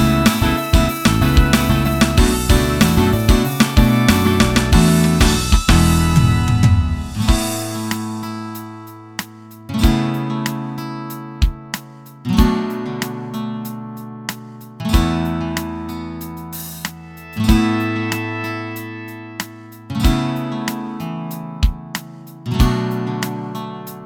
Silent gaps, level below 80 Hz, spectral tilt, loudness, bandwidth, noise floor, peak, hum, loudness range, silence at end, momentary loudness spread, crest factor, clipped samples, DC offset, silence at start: none; -22 dBFS; -5.5 dB/octave; -17 LUFS; 18.5 kHz; -37 dBFS; 0 dBFS; none; 9 LU; 0 s; 16 LU; 16 dB; under 0.1%; under 0.1%; 0 s